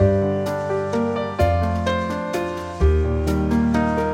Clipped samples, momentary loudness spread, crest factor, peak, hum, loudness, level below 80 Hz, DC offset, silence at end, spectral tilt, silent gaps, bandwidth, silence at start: under 0.1%; 5 LU; 14 dB; -6 dBFS; none; -21 LUFS; -28 dBFS; under 0.1%; 0 s; -7.5 dB/octave; none; 15.5 kHz; 0 s